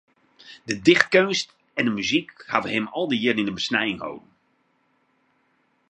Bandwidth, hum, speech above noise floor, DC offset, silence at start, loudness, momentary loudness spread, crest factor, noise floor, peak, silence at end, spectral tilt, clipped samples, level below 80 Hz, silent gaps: 10 kHz; none; 44 dB; under 0.1%; 0.45 s; -22 LUFS; 14 LU; 24 dB; -67 dBFS; 0 dBFS; 1.7 s; -4 dB/octave; under 0.1%; -64 dBFS; none